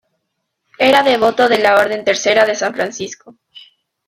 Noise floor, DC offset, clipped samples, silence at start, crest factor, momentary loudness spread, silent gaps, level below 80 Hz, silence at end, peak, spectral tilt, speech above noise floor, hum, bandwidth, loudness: -72 dBFS; under 0.1%; under 0.1%; 0.8 s; 14 dB; 11 LU; none; -58 dBFS; 0.45 s; -2 dBFS; -2.5 dB/octave; 59 dB; none; 16 kHz; -13 LUFS